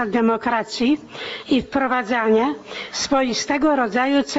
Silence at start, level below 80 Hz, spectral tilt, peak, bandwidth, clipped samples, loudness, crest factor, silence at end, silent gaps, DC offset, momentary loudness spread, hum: 0 s; -52 dBFS; -3.5 dB/octave; -6 dBFS; 8 kHz; under 0.1%; -20 LUFS; 14 dB; 0 s; none; under 0.1%; 7 LU; none